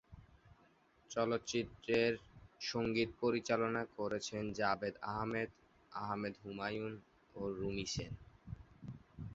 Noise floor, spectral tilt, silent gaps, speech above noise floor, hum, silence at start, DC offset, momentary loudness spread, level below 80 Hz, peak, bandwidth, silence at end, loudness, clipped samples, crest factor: -70 dBFS; -4 dB/octave; none; 31 dB; none; 0.1 s; under 0.1%; 18 LU; -64 dBFS; -20 dBFS; 8 kHz; 0 s; -39 LUFS; under 0.1%; 20 dB